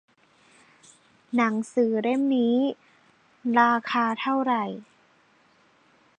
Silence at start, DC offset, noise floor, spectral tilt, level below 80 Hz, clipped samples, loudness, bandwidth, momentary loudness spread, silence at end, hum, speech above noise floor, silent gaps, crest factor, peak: 1.3 s; under 0.1%; -61 dBFS; -5.5 dB/octave; -82 dBFS; under 0.1%; -24 LUFS; 9.8 kHz; 11 LU; 1.35 s; none; 38 dB; none; 20 dB; -6 dBFS